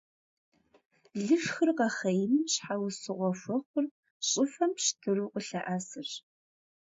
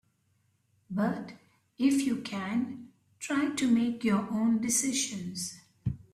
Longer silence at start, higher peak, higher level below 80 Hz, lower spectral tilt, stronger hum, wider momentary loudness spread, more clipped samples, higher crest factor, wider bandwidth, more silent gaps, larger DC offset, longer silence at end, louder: first, 1.15 s vs 0.9 s; about the same, -14 dBFS vs -16 dBFS; second, -82 dBFS vs -60 dBFS; about the same, -3.5 dB/octave vs -4 dB/octave; neither; about the same, 10 LU vs 12 LU; neither; about the same, 18 dB vs 16 dB; second, 8 kHz vs 15 kHz; first, 3.66-3.74 s, 3.91-4.03 s, 4.11-4.20 s vs none; neither; first, 0.75 s vs 0.1 s; about the same, -31 LUFS vs -30 LUFS